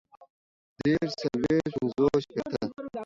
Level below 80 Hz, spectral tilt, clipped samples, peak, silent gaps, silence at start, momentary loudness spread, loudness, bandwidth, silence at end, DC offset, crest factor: -56 dBFS; -7 dB/octave; under 0.1%; -12 dBFS; 0.30-0.76 s; 0.2 s; 8 LU; -28 LUFS; 7.8 kHz; 0 s; under 0.1%; 18 dB